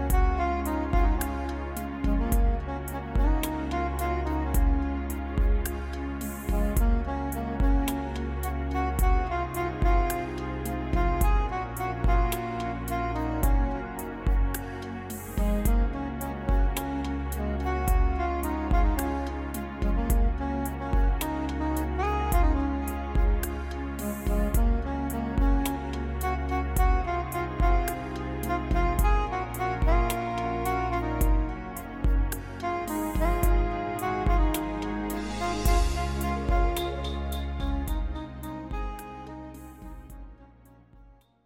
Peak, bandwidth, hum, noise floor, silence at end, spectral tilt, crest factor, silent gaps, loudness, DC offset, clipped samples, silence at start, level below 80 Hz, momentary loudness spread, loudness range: -12 dBFS; 17 kHz; none; -55 dBFS; 0.4 s; -6 dB/octave; 14 dB; none; -29 LUFS; under 0.1%; under 0.1%; 0 s; -28 dBFS; 8 LU; 2 LU